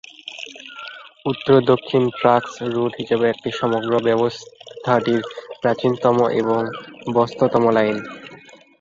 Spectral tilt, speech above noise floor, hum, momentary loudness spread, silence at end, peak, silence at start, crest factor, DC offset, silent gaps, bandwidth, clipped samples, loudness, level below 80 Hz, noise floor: -6.5 dB/octave; 26 dB; none; 18 LU; 0.45 s; -2 dBFS; 0.25 s; 18 dB; under 0.1%; none; 7.6 kHz; under 0.1%; -19 LUFS; -60 dBFS; -45 dBFS